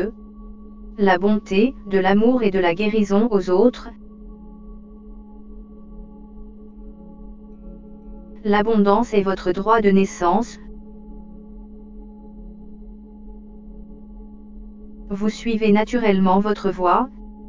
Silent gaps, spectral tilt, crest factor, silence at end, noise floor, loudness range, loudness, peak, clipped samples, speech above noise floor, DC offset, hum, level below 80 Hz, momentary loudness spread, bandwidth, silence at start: none; -7 dB/octave; 20 dB; 0 s; -39 dBFS; 23 LU; -19 LUFS; -2 dBFS; under 0.1%; 22 dB; under 0.1%; none; -42 dBFS; 25 LU; 7.6 kHz; 0 s